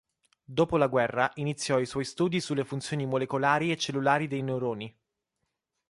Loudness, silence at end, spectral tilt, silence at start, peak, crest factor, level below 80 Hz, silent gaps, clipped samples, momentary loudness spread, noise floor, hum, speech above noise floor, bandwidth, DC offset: -28 LUFS; 1 s; -5.5 dB/octave; 0.5 s; -10 dBFS; 20 dB; -62 dBFS; none; under 0.1%; 7 LU; -82 dBFS; none; 54 dB; 11.5 kHz; under 0.1%